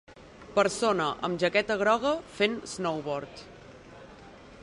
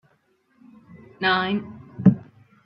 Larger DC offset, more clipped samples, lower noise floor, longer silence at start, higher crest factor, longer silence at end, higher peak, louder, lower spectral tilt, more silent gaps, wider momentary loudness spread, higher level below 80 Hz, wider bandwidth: neither; neither; second, -49 dBFS vs -65 dBFS; second, 0.1 s vs 0.95 s; about the same, 20 dB vs 22 dB; second, 0 s vs 0.45 s; second, -10 dBFS vs -2 dBFS; second, -28 LUFS vs -22 LUFS; second, -4 dB/octave vs -9.5 dB/octave; neither; first, 24 LU vs 13 LU; about the same, -60 dBFS vs -58 dBFS; first, 11.5 kHz vs 5.4 kHz